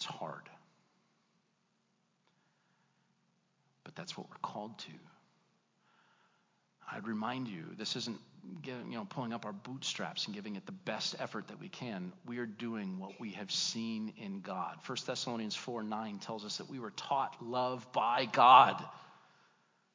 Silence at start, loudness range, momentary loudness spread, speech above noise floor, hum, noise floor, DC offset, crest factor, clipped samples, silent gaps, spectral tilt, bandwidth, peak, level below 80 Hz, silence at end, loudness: 0 s; 19 LU; 13 LU; 42 dB; none; -77 dBFS; under 0.1%; 30 dB; under 0.1%; none; -3.5 dB/octave; 7.6 kHz; -8 dBFS; under -90 dBFS; 0.8 s; -35 LUFS